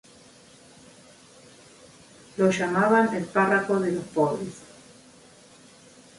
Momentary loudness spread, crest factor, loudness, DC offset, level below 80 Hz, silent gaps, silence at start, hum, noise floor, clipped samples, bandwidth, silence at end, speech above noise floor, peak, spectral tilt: 15 LU; 20 dB; -23 LUFS; under 0.1%; -66 dBFS; none; 2.35 s; none; -52 dBFS; under 0.1%; 11.5 kHz; 1.6 s; 29 dB; -8 dBFS; -6 dB/octave